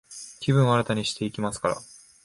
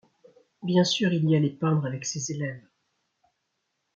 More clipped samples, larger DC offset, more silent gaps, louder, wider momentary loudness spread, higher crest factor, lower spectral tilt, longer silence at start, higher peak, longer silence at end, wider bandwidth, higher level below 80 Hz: neither; neither; neither; about the same, -25 LUFS vs -26 LUFS; about the same, 12 LU vs 12 LU; about the same, 18 dB vs 18 dB; about the same, -5.5 dB/octave vs -5.5 dB/octave; second, 0.1 s vs 0.6 s; about the same, -8 dBFS vs -10 dBFS; second, 0.4 s vs 1.35 s; first, 11.5 kHz vs 7.8 kHz; first, -56 dBFS vs -72 dBFS